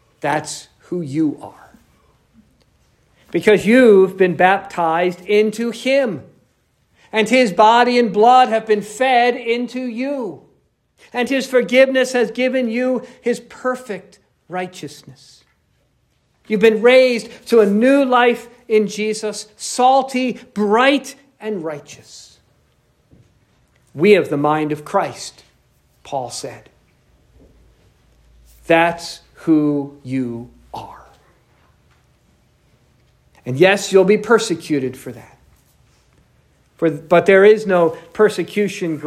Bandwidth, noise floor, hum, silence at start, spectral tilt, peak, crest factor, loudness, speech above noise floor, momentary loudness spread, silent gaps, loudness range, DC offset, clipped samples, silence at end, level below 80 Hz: 14 kHz; -62 dBFS; none; 0.25 s; -5 dB/octave; 0 dBFS; 18 dB; -16 LUFS; 46 dB; 18 LU; none; 11 LU; under 0.1%; under 0.1%; 0 s; -60 dBFS